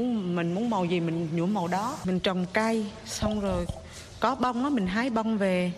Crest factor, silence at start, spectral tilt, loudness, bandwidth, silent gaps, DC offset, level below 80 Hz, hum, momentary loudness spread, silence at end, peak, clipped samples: 18 dB; 0 s; -6 dB/octave; -28 LUFS; 13.5 kHz; none; under 0.1%; -48 dBFS; none; 5 LU; 0 s; -10 dBFS; under 0.1%